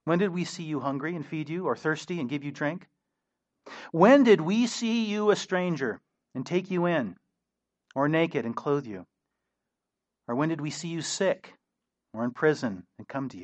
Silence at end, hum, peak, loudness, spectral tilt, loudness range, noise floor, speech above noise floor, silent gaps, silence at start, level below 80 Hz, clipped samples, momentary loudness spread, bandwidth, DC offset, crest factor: 0 s; none; -6 dBFS; -27 LUFS; -5.5 dB/octave; 8 LU; -86 dBFS; 59 dB; none; 0.05 s; -76 dBFS; under 0.1%; 16 LU; 8.4 kHz; under 0.1%; 24 dB